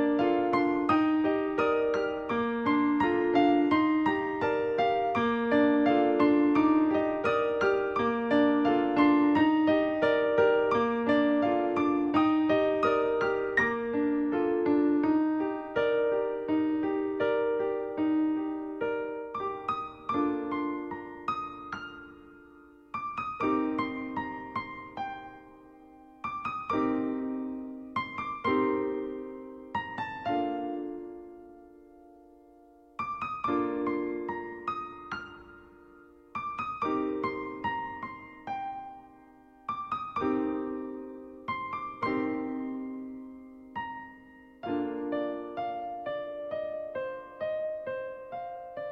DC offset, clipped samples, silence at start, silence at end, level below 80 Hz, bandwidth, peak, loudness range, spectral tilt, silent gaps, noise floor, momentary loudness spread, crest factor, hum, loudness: under 0.1%; under 0.1%; 0 s; 0 s; -62 dBFS; 6.4 kHz; -12 dBFS; 11 LU; -7 dB/octave; none; -57 dBFS; 15 LU; 18 dB; none; -29 LUFS